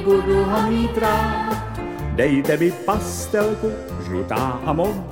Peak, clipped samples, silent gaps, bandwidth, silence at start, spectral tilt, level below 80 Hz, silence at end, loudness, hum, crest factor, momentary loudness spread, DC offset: -6 dBFS; under 0.1%; none; 17 kHz; 0 s; -6 dB/octave; -34 dBFS; 0 s; -21 LUFS; none; 14 dB; 8 LU; 0.2%